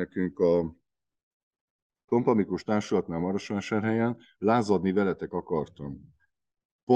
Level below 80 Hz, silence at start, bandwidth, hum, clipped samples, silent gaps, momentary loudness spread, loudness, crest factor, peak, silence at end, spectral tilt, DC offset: -64 dBFS; 0 s; 8.8 kHz; none; under 0.1%; 1.23-1.51 s, 1.61-1.90 s, 2.04-2.08 s, 6.65-6.87 s; 13 LU; -28 LUFS; 18 dB; -10 dBFS; 0 s; -7.5 dB/octave; under 0.1%